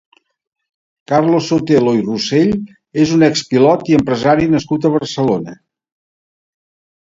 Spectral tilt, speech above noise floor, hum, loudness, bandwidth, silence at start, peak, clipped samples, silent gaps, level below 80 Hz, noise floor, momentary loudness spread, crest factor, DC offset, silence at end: -6 dB/octave; over 77 dB; none; -14 LUFS; 7.8 kHz; 1.1 s; 0 dBFS; under 0.1%; none; -48 dBFS; under -90 dBFS; 5 LU; 16 dB; under 0.1%; 1.5 s